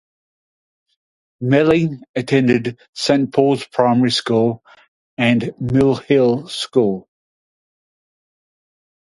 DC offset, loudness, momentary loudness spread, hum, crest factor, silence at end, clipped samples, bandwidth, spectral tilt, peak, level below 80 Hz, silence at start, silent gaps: under 0.1%; -17 LUFS; 9 LU; none; 18 dB; 2.2 s; under 0.1%; 11.5 kHz; -6 dB/octave; 0 dBFS; -52 dBFS; 1.4 s; 2.09-2.14 s, 2.89-2.93 s, 4.88-5.17 s